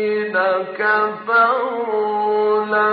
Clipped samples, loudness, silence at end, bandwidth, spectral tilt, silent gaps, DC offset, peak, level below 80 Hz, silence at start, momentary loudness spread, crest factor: under 0.1%; -18 LUFS; 0 s; 5.2 kHz; -1.5 dB/octave; none; under 0.1%; -4 dBFS; -70 dBFS; 0 s; 5 LU; 14 dB